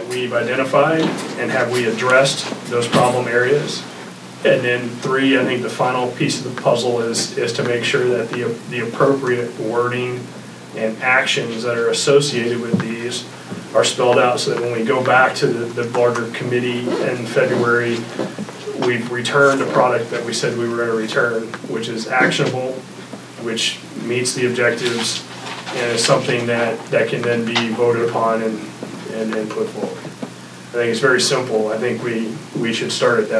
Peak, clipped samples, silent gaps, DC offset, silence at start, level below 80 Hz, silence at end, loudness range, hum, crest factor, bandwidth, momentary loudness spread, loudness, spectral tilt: 0 dBFS; under 0.1%; none; under 0.1%; 0 s; -68 dBFS; 0 s; 3 LU; none; 18 dB; 11 kHz; 12 LU; -18 LUFS; -4 dB/octave